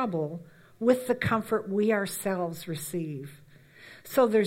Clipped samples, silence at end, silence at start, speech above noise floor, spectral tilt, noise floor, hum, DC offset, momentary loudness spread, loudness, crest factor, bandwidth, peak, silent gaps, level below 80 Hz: under 0.1%; 0 s; 0 s; 24 dB; -5.5 dB/octave; -52 dBFS; none; under 0.1%; 16 LU; -29 LUFS; 18 dB; 16.5 kHz; -10 dBFS; none; -66 dBFS